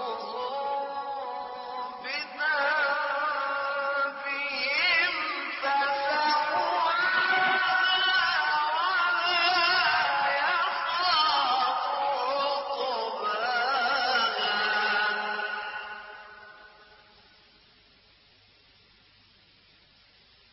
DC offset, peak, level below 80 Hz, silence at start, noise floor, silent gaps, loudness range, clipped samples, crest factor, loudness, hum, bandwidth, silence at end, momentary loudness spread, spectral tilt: under 0.1%; -14 dBFS; -70 dBFS; 0 s; -60 dBFS; none; 6 LU; under 0.1%; 16 dB; -26 LUFS; none; 6 kHz; 3.85 s; 11 LU; -4 dB/octave